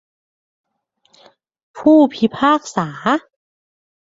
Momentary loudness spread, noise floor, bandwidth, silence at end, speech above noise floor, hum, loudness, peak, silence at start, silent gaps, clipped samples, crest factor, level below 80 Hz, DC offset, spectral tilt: 9 LU; -63 dBFS; 7.8 kHz; 0.95 s; 49 dB; none; -16 LUFS; -2 dBFS; 1.75 s; none; under 0.1%; 18 dB; -60 dBFS; under 0.1%; -5.5 dB/octave